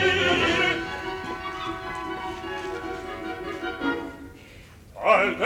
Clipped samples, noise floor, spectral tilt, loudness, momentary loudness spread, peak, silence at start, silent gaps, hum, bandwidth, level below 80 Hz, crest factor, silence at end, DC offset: under 0.1%; -47 dBFS; -4 dB/octave; -26 LUFS; 19 LU; -6 dBFS; 0 s; none; none; 19 kHz; -50 dBFS; 20 dB; 0 s; under 0.1%